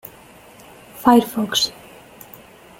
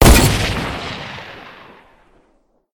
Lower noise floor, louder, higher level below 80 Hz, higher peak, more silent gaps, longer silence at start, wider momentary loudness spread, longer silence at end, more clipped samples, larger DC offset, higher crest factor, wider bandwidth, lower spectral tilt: second, -45 dBFS vs -59 dBFS; about the same, -18 LUFS vs -17 LUFS; second, -56 dBFS vs -22 dBFS; about the same, -2 dBFS vs 0 dBFS; neither; first, 0.95 s vs 0 s; about the same, 26 LU vs 24 LU; second, 1.1 s vs 1.25 s; neither; neither; about the same, 20 dB vs 18 dB; second, 17 kHz vs 19 kHz; about the same, -3.5 dB/octave vs -4.5 dB/octave